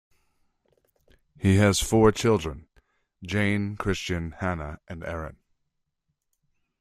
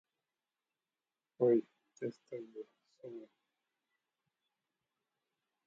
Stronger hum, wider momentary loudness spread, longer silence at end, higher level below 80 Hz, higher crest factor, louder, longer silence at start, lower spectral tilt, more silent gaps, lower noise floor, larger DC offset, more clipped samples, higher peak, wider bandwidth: neither; second, 17 LU vs 22 LU; second, 1.5 s vs 2.4 s; first, -46 dBFS vs under -90 dBFS; about the same, 22 dB vs 24 dB; first, -25 LUFS vs -36 LUFS; about the same, 1.4 s vs 1.4 s; second, -5.5 dB/octave vs -8.5 dB/octave; neither; second, -79 dBFS vs under -90 dBFS; neither; neither; first, -6 dBFS vs -18 dBFS; first, 15.5 kHz vs 7.2 kHz